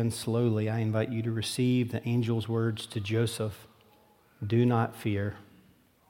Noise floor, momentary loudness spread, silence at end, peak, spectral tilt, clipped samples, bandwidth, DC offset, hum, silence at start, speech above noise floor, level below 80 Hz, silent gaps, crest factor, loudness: -62 dBFS; 9 LU; 0.65 s; -12 dBFS; -6.5 dB/octave; under 0.1%; 16.5 kHz; under 0.1%; none; 0 s; 33 dB; -68 dBFS; none; 16 dB; -30 LUFS